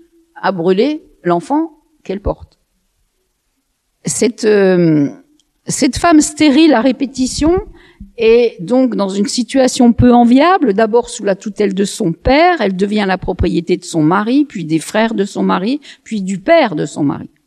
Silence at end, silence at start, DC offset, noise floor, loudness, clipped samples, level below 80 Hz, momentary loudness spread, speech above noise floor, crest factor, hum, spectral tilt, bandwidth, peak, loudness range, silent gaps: 0.2 s; 0.35 s; under 0.1%; -66 dBFS; -13 LUFS; under 0.1%; -34 dBFS; 11 LU; 53 dB; 14 dB; none; -5 dB/octave; 13.5 kHz; 0 dBFS; 7 LU; none